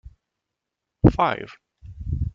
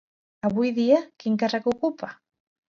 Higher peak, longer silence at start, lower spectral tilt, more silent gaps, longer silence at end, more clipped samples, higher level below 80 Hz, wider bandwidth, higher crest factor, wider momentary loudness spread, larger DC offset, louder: first, -2 dBFS vs -8 dBFS; first, 1.05 s vs 0.45 s; first, -9 dB/octave vs -6.5 dB/octave; neither; second, 0.05 s vs 0.6 s; neither; first, -36 dBFS vs -66 dBFS; about the same, 7 kHz vs 7.2 kHz; about the same, 22 dB vs 18 dB; first, 19 LU vs 9 LU; neither; about the same, -22 LUFS vs -24 LUFS